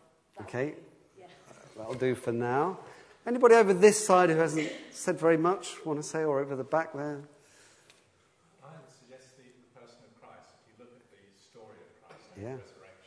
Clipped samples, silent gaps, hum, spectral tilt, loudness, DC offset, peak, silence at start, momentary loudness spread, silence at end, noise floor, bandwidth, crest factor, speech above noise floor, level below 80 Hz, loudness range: under 0.1%; none; none; -5 dB/octave; -27 LUFS; under 0.1%; -6 dBFS; 0.35 s; 22 LU; 0.45 s; -67 dBFS; 11 kHz; 24 dB; 40 dB; -78 dBFS; 12 LU